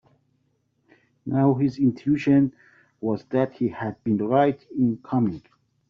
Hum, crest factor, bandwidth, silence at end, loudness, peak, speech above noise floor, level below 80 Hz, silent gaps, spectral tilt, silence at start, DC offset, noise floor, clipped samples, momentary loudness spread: none; 18 dB; 6.6 kHz; 0.5 s; -23 LUFS; -6 dBFS; 47 dB; -62 dBFS; none; -8.5 dB/octave; 1.25 s; under 0.1%; -70 dBFS; under 0.1%; 9 LU